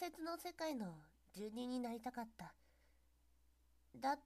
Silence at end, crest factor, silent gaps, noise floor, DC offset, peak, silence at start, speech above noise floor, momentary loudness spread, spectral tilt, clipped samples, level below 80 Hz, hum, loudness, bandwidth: 0.05 s; 20 dB; none; -75 dBFS; under 0.1%; -28 dBFS; 0 s; 29 dB; 15 LU; -4.5 dB/octave; under 0.1%; -76 dBFS; none; -47 LUFS; 15 kHz